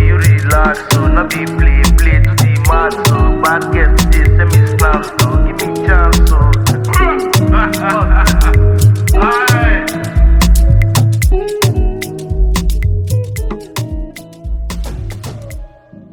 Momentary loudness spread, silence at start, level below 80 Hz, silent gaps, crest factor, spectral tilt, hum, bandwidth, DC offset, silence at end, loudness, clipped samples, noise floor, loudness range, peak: 13 LU; 0 s; -14 dBFS; none; 10 dB; -5.5 dB/octave; none; 19.5 kHz; under 0.1%; 0.45 s; -12 LUFS; under 0.1%; -34 dBFS; 8 LU; 0 dBFS